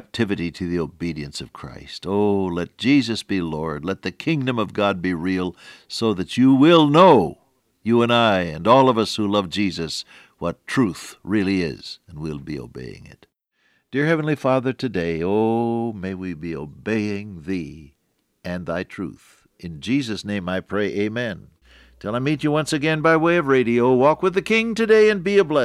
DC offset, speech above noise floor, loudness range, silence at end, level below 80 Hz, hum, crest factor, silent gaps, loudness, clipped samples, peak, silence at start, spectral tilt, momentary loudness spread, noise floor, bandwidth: under 0.1%; 45 dB; 11 LU; 0 s; -52 dBFS; none; 18 dB; none; -20 LUFS; under 0.1%; -2 dBFS; 0.15 s; -6 dB/octave; 17 LU; -66 dBFS; 13 kHz